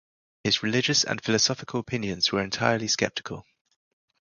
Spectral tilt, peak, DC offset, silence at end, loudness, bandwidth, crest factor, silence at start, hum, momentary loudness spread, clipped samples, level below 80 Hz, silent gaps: -3 dB/octave; -4 dBFS; under 0.1%; 0.8 s; -25 LUFS; 11 kHz; 22 dB; 0.45 s; none; 10 LU; under 0.1%; -58 dBFS; none